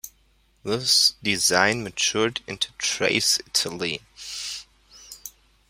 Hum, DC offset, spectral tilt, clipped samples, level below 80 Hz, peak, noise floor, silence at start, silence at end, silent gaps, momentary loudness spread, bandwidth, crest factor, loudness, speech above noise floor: none; under 0.1%; -1.5 dB/octave; under 0.1%; -58 dBFS; -2 dBFS; -62 dBFS; 0.05 s; 0.4 s; none; 22 LU; 16 kHz; 24 dB; -22 LUFS; 38 dB